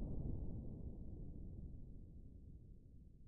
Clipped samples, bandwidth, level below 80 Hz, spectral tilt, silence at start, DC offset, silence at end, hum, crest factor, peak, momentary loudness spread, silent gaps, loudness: under 0.1%; 1.3 kHz; -52 dBFS; -12 dB/octave; 0 s; under 0.1%; 0 s; none; 18 dB; -32 dBFS; 14 LU; none; -53 LUFS